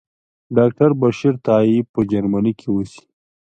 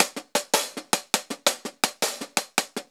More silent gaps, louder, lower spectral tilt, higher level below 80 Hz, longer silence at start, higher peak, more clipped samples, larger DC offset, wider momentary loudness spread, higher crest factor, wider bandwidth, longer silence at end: first, 1.89-1.94 s vs none; first, -17 LUFS vs -25 LUFS; first, -8.5 dB/octave vs -0.5 dB/octave; first, -50 dBFS vs -82 dBFS; first, 0.5 s vs 0 s; about the same, -2 dBFS vs 0 dBFS; neither; neither; first, 8 LU vs 4 LU; second, 16 dB vs 28 dB; second, 8.8 kHz vs over 20 kHz; first, 0.55 s vs 0.1 s